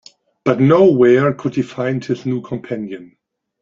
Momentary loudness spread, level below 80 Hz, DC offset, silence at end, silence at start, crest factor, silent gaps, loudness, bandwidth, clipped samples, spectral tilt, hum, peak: 15 LU; -56 dBFS; under 0.1%; 0.55 s; 0.45 s; 16 dB; none; -16 LUFS; 7.4 kHz; under 0.1%; -8.5 dB/octave; none; 0 dBFS